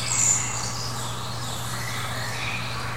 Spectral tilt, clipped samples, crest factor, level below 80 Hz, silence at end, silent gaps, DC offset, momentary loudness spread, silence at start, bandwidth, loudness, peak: -2 dB/octave; under 0.1%; 18 dB; -48 dBFS; 0 s; none; 2%; 11 LU; 0 s; 17 kHz; -26 LUFS; -10 dBFS